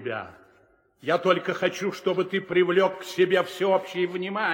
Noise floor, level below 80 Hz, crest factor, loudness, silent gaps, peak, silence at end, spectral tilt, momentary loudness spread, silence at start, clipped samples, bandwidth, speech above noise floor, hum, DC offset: -61 dBFS; -72 dBFS; 18 dB; -25 LUFS; none; -8 dBFS; 0 s; -5.5 dB/octave; 8 LU; 0 s; under 0.1%; 17 kHz; 37 dB; none; under 0.1%